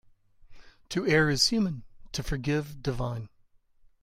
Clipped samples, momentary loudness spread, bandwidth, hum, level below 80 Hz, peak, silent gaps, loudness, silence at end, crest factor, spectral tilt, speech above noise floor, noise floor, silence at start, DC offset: under 0.1%; 15 LU; 16 kHz; none; -46 dBFS; -10 dBFS; none; -28 LUFS; 0.75 s; 20 dB; -4.5 dB/octave; 34 dB; -62 dBFS; 0.5 s; under 0.1%